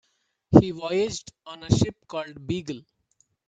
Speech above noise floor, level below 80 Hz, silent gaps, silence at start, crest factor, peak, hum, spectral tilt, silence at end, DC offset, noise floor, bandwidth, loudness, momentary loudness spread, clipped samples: 41 dB; -48 dBFS; none; 0.5 s; 24 dB; 0 dBFS; none; -6.5 dB/octave; 0.7 s; under 0.1%; -68 dBFS; 9.2 kHz; -24 LUFS; 20 LU; under 0.1%